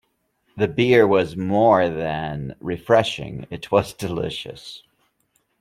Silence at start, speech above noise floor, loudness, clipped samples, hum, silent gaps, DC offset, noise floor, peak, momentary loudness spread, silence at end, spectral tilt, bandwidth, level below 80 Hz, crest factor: 0.55 s; 48 dB; -20 LUFS; under 0.1%; none; none; under 0.1%; -68 dBFS; -2 dBFS; 17 LU; 0.85 s; -6 dB/octave; 15 kHz; -52 dBFS; 20 dB